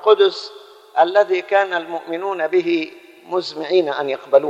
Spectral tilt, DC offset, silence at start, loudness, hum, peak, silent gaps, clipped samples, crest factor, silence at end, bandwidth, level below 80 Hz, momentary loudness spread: -4.5 dB/octave; under 0.1%; 0 s; -19 LUFS; none; 0 dBFS; none; under 0.1%; 18 dB; 0 s; 8 kHz; -78 dBFS; 10 LU